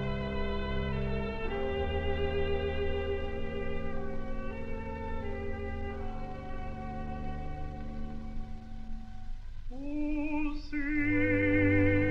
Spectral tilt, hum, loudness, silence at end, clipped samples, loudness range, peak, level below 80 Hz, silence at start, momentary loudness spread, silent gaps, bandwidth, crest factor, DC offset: -8.5 dB/octave; none; -34 LUFS; 0 s; under 0.1%; 10 LU; -14 dBFS; -38 dBFS; 0 s; 17 LU; none; 6 kHz; 18 dB; under 0.1%